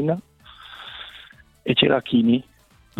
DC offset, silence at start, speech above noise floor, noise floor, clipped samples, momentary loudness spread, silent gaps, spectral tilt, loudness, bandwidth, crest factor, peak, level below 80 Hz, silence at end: under 0.1%; 0 s; 29 dB; -48 dBFS; under 0.1%; 21 LU; none; -7.5 dB/octave; -20 LUFS; 4.4 kHz; 22 dB; -2 dBFS; -58 dBFS; 0.6 s